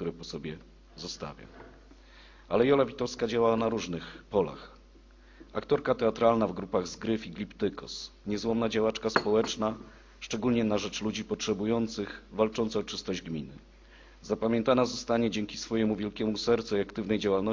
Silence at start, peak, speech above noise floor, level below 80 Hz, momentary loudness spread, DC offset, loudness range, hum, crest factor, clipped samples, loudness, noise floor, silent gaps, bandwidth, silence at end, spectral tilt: 0 s; -8 dBFS; 25 dB; -54 dBFS; 14 LU; under 0.1%; 2 LU; none; 22 dB; under 0.1%; -30 LUFS; -55 dBFS; none; 7.6 kHz; 0 s; -5 dB/octave